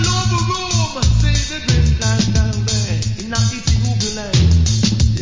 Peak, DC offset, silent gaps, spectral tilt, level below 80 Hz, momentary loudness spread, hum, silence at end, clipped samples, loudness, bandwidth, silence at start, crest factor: -2 dBFS; under 0.1%; none; -4.5 dB/octave; -20 dBFS; 4 LU; none; 0 s; under 0.1%; -16 LUFS; 7.6 kHz; 0 s; 14 dB